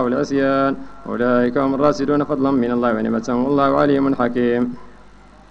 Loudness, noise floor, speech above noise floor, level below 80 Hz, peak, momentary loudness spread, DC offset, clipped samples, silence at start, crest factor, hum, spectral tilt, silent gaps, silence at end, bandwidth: -18 LUFS; -44 dBFS; 27 dB; -46 dBFS; -2 dBFS; 6 LU; under 0.1%; under 0.1%; 0 s; 16 dB; 50 Hz at -45 dBFS; -7 dB/octave; none; 0.55 s; 7.6 kHz